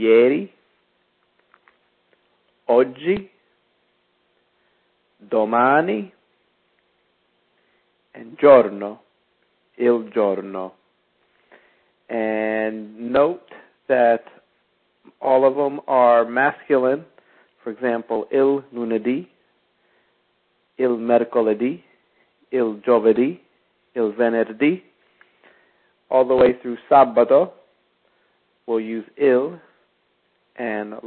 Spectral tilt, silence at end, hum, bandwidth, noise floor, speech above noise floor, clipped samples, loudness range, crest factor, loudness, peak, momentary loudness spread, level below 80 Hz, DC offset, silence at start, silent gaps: -10.5 dB/octave; 0 s; none; 4.3 kHz; -67 dBFS; 48 dB; under 0.1%; 7 LU; 20 dB; -19 LUFS; 0 dBFS; 16 LU; -64 dBFS; under 0.1%; 0 s; none